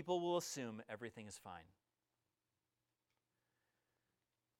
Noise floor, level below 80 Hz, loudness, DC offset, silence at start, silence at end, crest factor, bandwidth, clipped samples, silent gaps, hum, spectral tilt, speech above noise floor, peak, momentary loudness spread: under -90 dBFS; -86 dBFS; -45 LUFS; under 0.1%; 0 s; 2.95 s; 22 dB; 16 kHz; under 0.1%; none; none; -4 dB/octave; over 45 dB; -26 dBFS; 16 LU